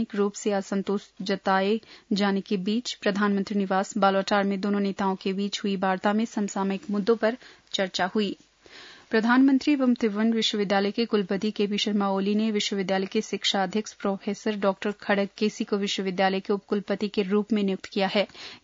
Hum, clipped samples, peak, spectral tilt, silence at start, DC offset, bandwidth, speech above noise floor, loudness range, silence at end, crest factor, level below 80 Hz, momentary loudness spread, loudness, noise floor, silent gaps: none; under 0.1%; -8 dBFS; -5 dB/octave; 0 s; under 0.1%; 7.8 kHz; 23 dB; 3 LU; 0.05 s; 18 dB; -70 dBFS; 6 LU; -26 LUFS; -49 dBFS; none